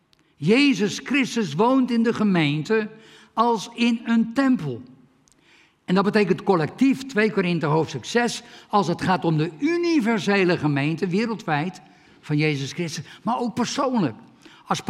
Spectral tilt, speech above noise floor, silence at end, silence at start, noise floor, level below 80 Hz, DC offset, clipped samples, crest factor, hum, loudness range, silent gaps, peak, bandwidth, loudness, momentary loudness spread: -6 dB/octave; 36 dB; 0.1 s; 0.4 s; -57 dBFS; -66 dBFS; under 0.1%; under 0.1%; 18 dB; none; 4 LU; none; -6 dBFS; 13 kHz; -22 LUFS; 8 LU